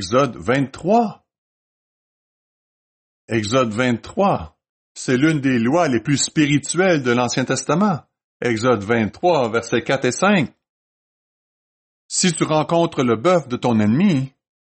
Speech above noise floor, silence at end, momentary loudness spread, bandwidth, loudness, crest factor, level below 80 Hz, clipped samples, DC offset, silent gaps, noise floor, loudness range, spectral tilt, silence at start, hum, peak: over 72 dB; 0.4 s; 6 LU; 8.8 kHz; -19 LUFS; 14 dB; -56 dBFS; under 0.1%; under 0.1%; 1.38-3.28 s, 4.69-4.95 s, 8.24-8.40 s, 10.69-12.09 s; under -90 dBFS; 5 LU; -5 dB/octave; 0 s; none; -4 dBFS